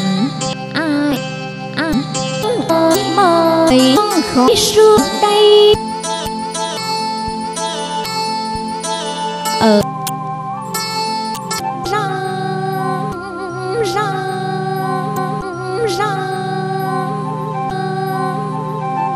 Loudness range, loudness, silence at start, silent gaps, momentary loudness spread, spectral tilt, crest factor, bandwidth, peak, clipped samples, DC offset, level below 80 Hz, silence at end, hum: 9 LU; -16 LUFS; 0 s; none; 11 LU; -4.5 dB/octave; 16 dB; 15 kHz; 0 dBFS; under 0.1%; under 0.1%; -44 dBFS; 0 s; none